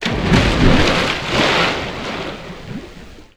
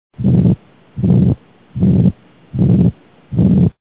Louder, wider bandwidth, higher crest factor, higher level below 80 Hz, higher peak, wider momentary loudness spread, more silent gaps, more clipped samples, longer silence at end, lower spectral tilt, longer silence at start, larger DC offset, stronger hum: about the same, -16 LUFS vs -14 LUFS; first, 14.5 kHz vs 4 kHz; about the same, 16 dB vs 14 dB; about the same, -26 dBFS vs -30 dBFS; about the same, 0 dBFS vs 0 dBFS; first, 18 LU vs 11 LU; neither; neither; about the same, 0.15 s vs 0.1 s; second, -5 dB/octave vs -14 dB/octave; second, 0 s vs 0.2 s; second, under 0.1% vs 0.2%; neither